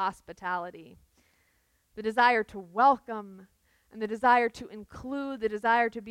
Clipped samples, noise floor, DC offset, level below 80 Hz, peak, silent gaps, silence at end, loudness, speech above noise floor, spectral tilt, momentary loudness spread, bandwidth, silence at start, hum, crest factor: under 0.1%; -71 dBFS; under 0.1%; -64 dBFS; -10 dBFS; none; 0 s; -27 LUFS; 42 dB; -5 dB/octave; 19 LU; 13.5 kHz; 0 s; none; 20 dB